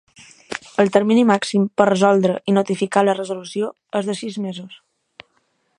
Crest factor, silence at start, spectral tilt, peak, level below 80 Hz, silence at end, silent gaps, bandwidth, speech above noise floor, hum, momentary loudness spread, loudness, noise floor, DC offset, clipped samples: 20 dB; 0.5 s; -6 dB/octave; 0 dBFS; -66 dBFS; 1.05 s; none; 10.5 kHz; 48 dB; none; 13 LU; -19 LUFS; -66 dBFS; under 0.1%; under 0.1%